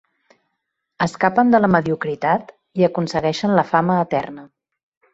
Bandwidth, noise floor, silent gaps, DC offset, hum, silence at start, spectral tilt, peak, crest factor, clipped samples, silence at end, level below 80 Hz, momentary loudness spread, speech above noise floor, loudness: 8 kHz; -76 dBFS; none; under 0.1%; none; 1 s; -7 dB/octave; -2 dBFS; 18 dB; under 0.1%; 0.7 s; -56 dBFS; 9 LU; 59 dB; -18 LUFS